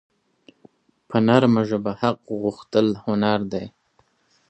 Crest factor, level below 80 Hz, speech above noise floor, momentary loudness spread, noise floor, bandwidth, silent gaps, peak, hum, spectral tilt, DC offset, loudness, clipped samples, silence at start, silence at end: 22 dB; -58 dBFS; 43 dB; 11 LU; -64 dBFS; 8.4 kHz; none; -2 dBFS; none; -7.5 dB/octave; under 0.1%; -21 LUFS; under 0.1%; 1.1 s; 0.8 s